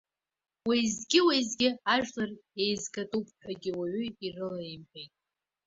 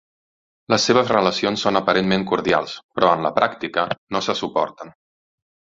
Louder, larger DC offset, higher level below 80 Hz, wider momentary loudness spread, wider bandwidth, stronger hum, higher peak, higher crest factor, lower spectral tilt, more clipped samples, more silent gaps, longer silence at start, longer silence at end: second, -30 LUFS vs -20 LUFS; neither; second, -68 dBFS vs -56 dBFS; first, 16 LU vs 7 LU; about the same, 8 kHz vs 7.8 kHz; neither; second, -10 dBFS vs -2 dBFS; about the same, 22 dB vs 20 dB; second, -3 dB/octave vs -4.5 dB/octave; neither; second, none vs 2.84-2.89 s, 3.98-4.07 s; about the same, 0.65 s vs 0.7 s; second, 0.6 s vs 0.85 s